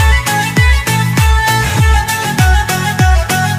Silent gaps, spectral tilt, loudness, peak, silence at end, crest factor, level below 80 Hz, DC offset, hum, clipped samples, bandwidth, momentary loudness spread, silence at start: none; -4 dB/octave; -11 LUFS; 0 dBFS; 0 s; 10 dB; -14 dBFS; under 0.1%; none; under 0.1%; 16 kHz; 2 LU; 0 s